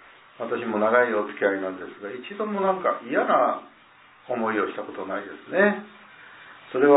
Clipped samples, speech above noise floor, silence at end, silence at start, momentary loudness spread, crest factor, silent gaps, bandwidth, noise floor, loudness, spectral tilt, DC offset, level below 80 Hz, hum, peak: under 0.1%; 29 dB; 0 s; 0.4 s; 15 LU; 20 dB; none; 4 kHz; -53 dBFS; -25 LUFS; -9.5 dB/octave; under 0.1%; -78 dBFS; none; -4 dBFS